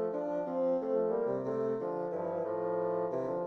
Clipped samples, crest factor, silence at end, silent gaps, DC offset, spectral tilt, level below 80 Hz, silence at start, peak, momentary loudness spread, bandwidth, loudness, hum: under 0.1%; 12 dB; 0 s; none; under 0.1%; -9.5 dB/octave; -76 dBFS; 0 s; -22 dBFS; 4 LU; 6.2 kHz; -34 LUFS; none